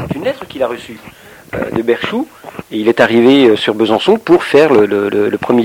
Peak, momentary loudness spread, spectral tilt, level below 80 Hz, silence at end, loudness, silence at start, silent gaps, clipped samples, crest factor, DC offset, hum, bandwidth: 0 dBFS; 15 LU; -6 dB/octave; -48 dBFS; 0 s; -12 LUFS; 0 s; none; 0.3%; 12 dB; under 0.1%; none; 16.5 kHz